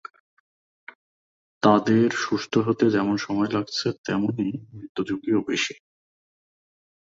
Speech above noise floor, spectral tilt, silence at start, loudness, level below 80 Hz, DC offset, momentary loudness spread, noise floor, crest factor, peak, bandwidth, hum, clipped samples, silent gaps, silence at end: over 67 dB; -5.5 dB/octave; 1.65 s; -23 LUFS; -62 dBFS; under 0.1%; 10 LU; under -90 dBFS; 22 dB; -4 dBFS; 7.8 kHz; none; under 0.1%; 3.98-4.04 s, 4.89-4.95 s; 1.3 s